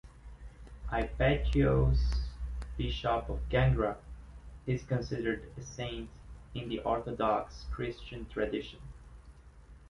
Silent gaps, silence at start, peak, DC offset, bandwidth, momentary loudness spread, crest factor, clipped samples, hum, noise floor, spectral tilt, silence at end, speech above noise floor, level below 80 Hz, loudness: none; 0.05 s; -16 dBFS; under 0.1%; 10.5 kHz; 22 LU; 18 dB; under 0.1%; none; -54 dBFS; -7 dB/octave; 0 s; 22 dB; -38 dBFS; -33 LUFS